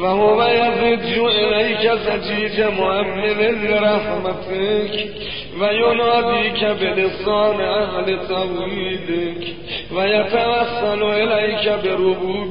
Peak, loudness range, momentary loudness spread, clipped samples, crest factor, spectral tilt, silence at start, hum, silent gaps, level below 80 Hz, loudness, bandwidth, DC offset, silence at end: -4 dBFS; 3 LU; 8 LU; under 0.1%; 14 dB; -10 dB/octave; 0 s; none; none; -46 dBFS; -18 LUFS; 5.4 kHz; 1%; 0 s